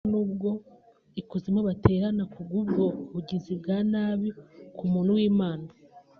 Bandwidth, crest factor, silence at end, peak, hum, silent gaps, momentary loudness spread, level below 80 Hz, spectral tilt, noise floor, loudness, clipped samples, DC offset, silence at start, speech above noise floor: 4.9 kHz; 24 dB; 0.2 s; -4 dBFS; none; none; 14 LU; -54 dBFS; -8 dB/octave; -57 dBFS; -28 LUFS; under 0.1%; under 0.1%; 0.05 s; 31 dB